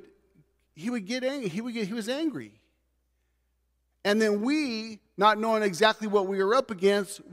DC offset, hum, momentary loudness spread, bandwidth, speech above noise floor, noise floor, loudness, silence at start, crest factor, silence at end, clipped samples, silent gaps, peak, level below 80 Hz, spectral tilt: under 0.1%; none; 10 LU; 15.5 kHz; 47 dB; -74 dBFS; -27 LUFS; 0.75 s; 22 dB; 0 s; under 0.1%; none; -6 dBFS; -74 dBFS; -4.5 dB/octave